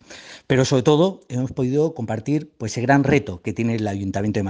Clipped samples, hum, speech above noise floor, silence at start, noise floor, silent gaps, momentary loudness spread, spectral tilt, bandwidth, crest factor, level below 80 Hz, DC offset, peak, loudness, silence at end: under 0.1%; none; 22 dB; 0.1 s; -42 dBFS; none; 10 LU; -6.5 dB/octave; 9.8 kHz; 18 dB; -52 dBFS; under 0.1%; -4 dBFS; -21 LUFS; 0 s